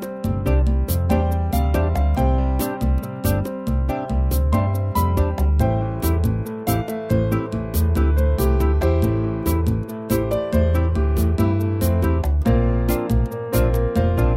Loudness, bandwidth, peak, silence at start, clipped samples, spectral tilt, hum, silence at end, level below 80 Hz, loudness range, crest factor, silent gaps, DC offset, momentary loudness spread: -21 LUFS; 16.5 kHz; -6 dBFS; 0 s; under 0.1%; -7.5 dB/octave; none; 0 s; -22 dBFS; 1 LU; 12 dB; none; under 0.1%; 4 LU